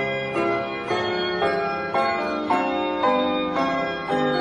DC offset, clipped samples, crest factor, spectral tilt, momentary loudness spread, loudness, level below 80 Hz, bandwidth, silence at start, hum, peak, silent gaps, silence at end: under 0.1%; under 0.1%; 14 dB; -5.5 dB/octave; 3 LU; -23 LUFS; -56 dBFS; 10.5 kHz; 0 s; none; -8 dBFS; none; 0 s